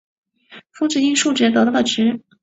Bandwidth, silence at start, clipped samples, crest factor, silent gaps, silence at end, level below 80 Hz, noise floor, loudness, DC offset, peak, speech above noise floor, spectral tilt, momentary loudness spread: 8.2 kHz; 0.5 s; under 0.1%; 14 dB; none; 0.25 s; -62 dBFS; -45 dBFS; -17 LUFS; under 0.1%; -4 dBFS; 29 dB; -3 dB/octave; 5 LU